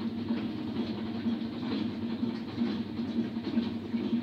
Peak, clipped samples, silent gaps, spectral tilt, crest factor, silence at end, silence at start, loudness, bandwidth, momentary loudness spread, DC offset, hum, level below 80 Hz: -18 dBFS; under 0.1%; none; -8 dB/octave; 14 dB; 0 s; 0 s; -34 LUFS; 6.4 kHz; 2 LU; under 0.1%; none; -66 dBFS